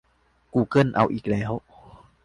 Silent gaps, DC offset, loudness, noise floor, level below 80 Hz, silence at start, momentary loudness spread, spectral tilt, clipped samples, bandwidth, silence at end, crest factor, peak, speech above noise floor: none; under 0.1%; -24 LUFS; -63 dBFS; -52 dBFS; 0.55 s; 10 LU; -8 dB/octave; under 0.1%; 11 kHz; 0.65 s; 20 dB; -6 dBFS; 41 dB